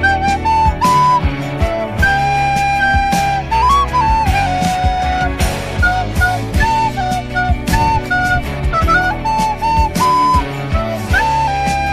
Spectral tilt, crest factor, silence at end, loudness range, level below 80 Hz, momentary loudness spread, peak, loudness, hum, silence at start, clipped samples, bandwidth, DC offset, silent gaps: -5 dB/octave; 12 dB; 0 s; 2 LU; -22 dBFS; 6 LU; -2 dBFS; -14 LUFS; none; 0 s; under 0.1%; 15.5 kHz; 0.6%; none